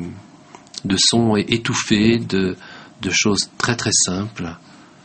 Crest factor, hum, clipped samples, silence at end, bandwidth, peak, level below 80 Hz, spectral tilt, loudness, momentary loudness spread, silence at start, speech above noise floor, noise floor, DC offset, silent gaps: 18 dB; none; under 0.1%; 0.45 s; 8.8 kHz; -2 dBFS; -48 dBFS; -3.5 dB/octave; -18 LUFS; 16 LU; 0 s; 25 dB; -44 dBFS; under 0.1%; none